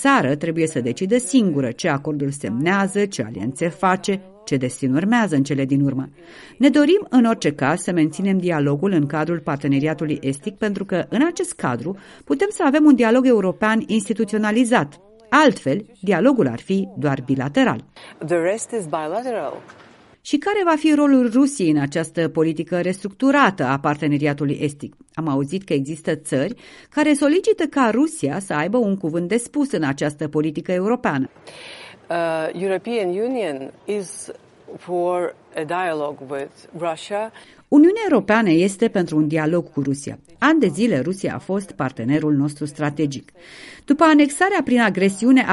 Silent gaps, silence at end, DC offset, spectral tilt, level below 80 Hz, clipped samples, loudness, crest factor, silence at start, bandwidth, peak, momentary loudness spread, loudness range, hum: none; 0 s; under 0.1%; -6 dB/octave; -60 dBFS; under 0.1%; -20 LUFS; 20 dB; 0 s; 11.5 kHz; 0 dBFS; 12 LU; 5 LU; none